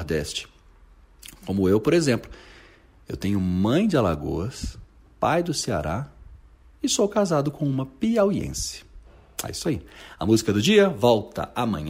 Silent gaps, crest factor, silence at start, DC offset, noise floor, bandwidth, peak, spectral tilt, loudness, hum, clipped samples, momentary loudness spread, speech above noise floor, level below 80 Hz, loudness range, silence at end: none; 18 dB; 0 s; under 0.1%; -52 dBFS; 16 kHz; -6 dBFS; -5 dB/octave; -23 LUFS; none; under 0.1%; 17 LU; 29 dB; -44 dBFS; 3 LU; 0 s